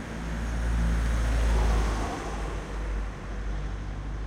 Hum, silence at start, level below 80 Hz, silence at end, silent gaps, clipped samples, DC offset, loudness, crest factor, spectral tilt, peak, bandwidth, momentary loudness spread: none; 0 s; -28 dBFS; 0 s; none; under 0.1%; under 0.1%; -31 LUFS; 12 dB; -6 dB/octave; -14 dBFS; 11 kHz; 10 LU